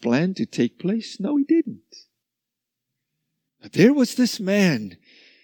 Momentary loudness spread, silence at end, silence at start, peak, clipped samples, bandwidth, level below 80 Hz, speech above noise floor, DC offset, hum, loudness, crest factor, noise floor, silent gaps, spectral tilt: 11 LU; 0.5 s; 0 s; -4 dBFS; under 0.1%; 19 kHz; -74 dBFS; 63 dB; under 0.1%; none; -21 LUFS; 20 dB; -84 dBFS; none; -6 dB/octave